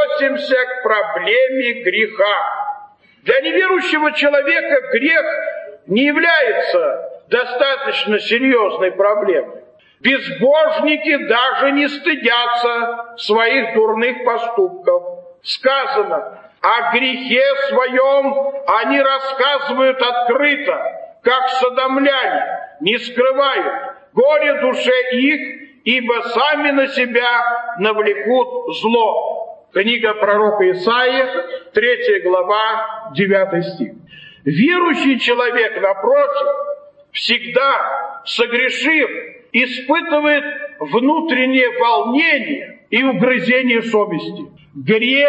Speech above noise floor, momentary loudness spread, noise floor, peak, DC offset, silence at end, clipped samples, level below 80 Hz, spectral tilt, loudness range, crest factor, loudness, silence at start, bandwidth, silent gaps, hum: 26 dB; 9 LU; -41 dBFS; 0 dBFS; under 0.1%; 0 s; under 0.1%; -68 dBFS; -5 dB/octave; 2 LU; 16 dB; -15 LUFS; 0 s; 8.6 kHz; none; none